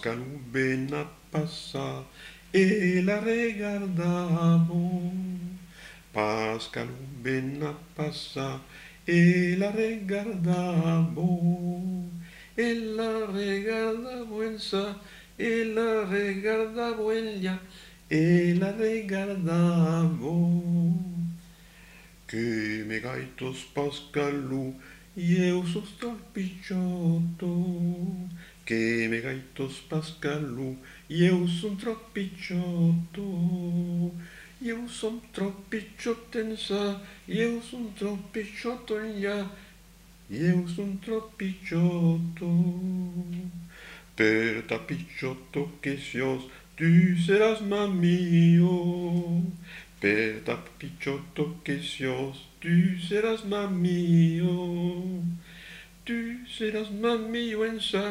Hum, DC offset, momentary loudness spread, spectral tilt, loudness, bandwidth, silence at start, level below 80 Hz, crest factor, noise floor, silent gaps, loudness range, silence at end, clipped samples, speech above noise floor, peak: none; under 0.1%; 13 LU; -7 dB/octave; -28 LUFS; 11.5 kHz; 0 s; -58 dBFS; 20 dB; -53 dBFS; none; 7 LU; 0 s; under 0.1%; 26 dB; -6 dBFS